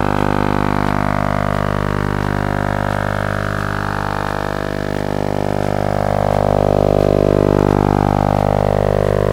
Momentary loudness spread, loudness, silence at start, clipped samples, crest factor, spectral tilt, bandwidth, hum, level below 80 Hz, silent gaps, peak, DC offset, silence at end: 6 LU; -17 LUFS; 0 s; under 0.1%; 16 dB; -7.5 dB/octave; 16 kHz; 50 Hz at -20 dBFS; -28 dBFS; none; 0 dBFS; under 0.1%; 0 s